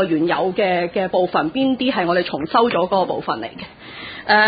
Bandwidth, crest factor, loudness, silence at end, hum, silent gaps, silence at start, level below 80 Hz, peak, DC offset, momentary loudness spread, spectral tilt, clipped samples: 5 kHz; 16 dB; -19 LUFS; 0 s; none; none; 0 s; -54 dBFS; -2 dBFS; under 0.1%; 14 LU; -10.5 dB/octave; under 0.1%